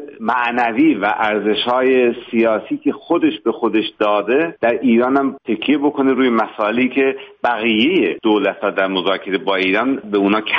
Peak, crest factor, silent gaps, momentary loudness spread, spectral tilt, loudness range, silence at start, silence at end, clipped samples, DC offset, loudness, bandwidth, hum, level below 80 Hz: -2 dBFS; 14 dB; none; 5 LU; -2.5 dB/octave; 1 LU; 0 s; 0 s; under 0.1%; under 0.1%; -16 LUFS; 5.8 kHz; none; -60 dBFS